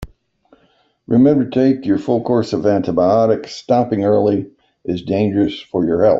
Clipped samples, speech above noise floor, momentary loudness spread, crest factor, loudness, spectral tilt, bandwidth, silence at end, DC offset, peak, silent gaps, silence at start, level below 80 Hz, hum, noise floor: under 0.1%; 43 dB; 8 LU; 14 dB; -16 LUFS; -8 dB/octave; 7.6 kHz; 0 s; under 0.1%; -2 dBFS; none; 0 s; -48 dBFS; none; -58 dBFS